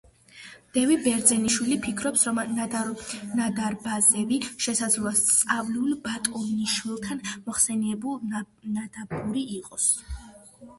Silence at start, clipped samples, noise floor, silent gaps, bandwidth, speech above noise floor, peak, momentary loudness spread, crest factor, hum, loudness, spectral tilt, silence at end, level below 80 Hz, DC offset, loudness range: 0.35 s; under 0.1%; -48 dBFS; none; 12 kHz; 22 dB; -4 dBFS; 13 LU; 22 dB; none; -25 LUFS; -2.5 dB/octave; 0.05 s; -52 dBFS; under 0.1%; 5 LU